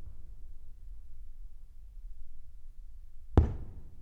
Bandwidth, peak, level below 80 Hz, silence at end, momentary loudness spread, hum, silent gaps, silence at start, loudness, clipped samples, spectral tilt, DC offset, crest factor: 6 kHz; -8 dBFS; -40 dBFS; 0 s; 27 LU; none; none; 0 s; -31 LUFS; under 0.1%; -10 dB/octave; under 0.1%; 28 dB